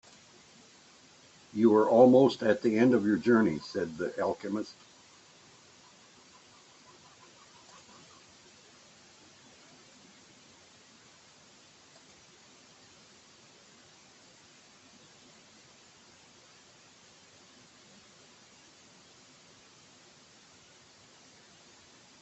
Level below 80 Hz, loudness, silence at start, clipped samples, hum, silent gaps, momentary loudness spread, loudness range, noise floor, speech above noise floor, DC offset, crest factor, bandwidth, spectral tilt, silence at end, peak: -76 dBFS; -26 LUFS; 1.55 s; under 0.1%; none; none; 32 LU; 15 LU; -58 dBFS; 33 dB; under 0.1%; 26 dB; 8.2 kHz; -6.5 dB/octave; 17.5 s; -8 dBFS